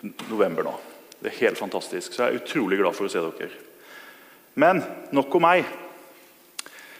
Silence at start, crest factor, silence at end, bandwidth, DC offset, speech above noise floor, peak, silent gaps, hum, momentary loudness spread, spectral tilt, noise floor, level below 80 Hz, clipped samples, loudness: 0.05 s; 22 dB; 0 s; 15.5 kHz; under 0.1%; 28 dB; -4 dBFS; none; none; 24 LU; -4.5 dB/octave; -52 dBFS; -76 dBFS; under 0.1%; -24 LUFS